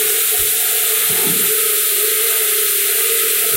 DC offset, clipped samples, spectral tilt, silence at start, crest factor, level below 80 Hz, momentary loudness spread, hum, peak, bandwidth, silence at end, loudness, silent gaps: under 0.1%; under 0.1%; 0.5 dB/octave; 0 s; 14 dB; -54 dBFS; 0 LU; none; -2 dBFS; 16.5 kHz; 0 s; -12 LUFS; none